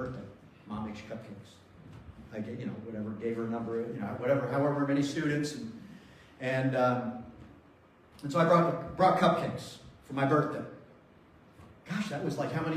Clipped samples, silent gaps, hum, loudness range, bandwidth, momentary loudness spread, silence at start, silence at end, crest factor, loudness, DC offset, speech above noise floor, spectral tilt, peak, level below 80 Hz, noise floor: under 0.1%; none; none; 10 LU; 14.5 kHz; 22 LU; 0 s; 0 s; 22 dB; -31 LUFS; under 0.1%; 29 dB; -6.5 dB/octave; -10 dBFS; -64 dBFS; -59 dBFS